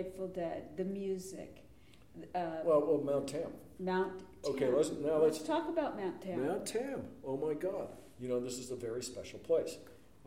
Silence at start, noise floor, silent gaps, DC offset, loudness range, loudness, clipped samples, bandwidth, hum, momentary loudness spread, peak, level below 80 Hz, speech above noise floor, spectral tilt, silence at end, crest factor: 0 s; -60 dBFS; none; under 0.1%; 5 LU; -36 LUFS; under 0.1%; 16 kHz; none; 13 LU; -20 dBFS; -68 dBFS; 24 dB; -5.5 dB/octave; 0.3 s; 18 dB